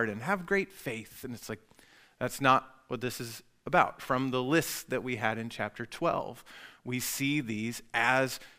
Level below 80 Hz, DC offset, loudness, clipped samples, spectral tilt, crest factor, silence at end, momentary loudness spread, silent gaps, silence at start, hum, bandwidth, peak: -62 dBFS; under 0.1%; -31 LUFS; under 0.1%; -4.5 dB/octave; 24 dB; 0.1 s; 16 LU; none; 0 s; none; 16 kHz; -8 dBFS